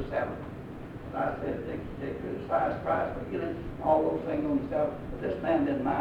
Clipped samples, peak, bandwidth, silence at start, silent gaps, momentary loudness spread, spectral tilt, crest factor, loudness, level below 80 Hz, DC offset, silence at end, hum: under 0.1%; -12 dBFS; 9 kHz; 0 s; none; 11 LU; -8.5 dB/octave; 18 dB; -31 LUFS; -50 dBFS; under 0.1%; 0 s; none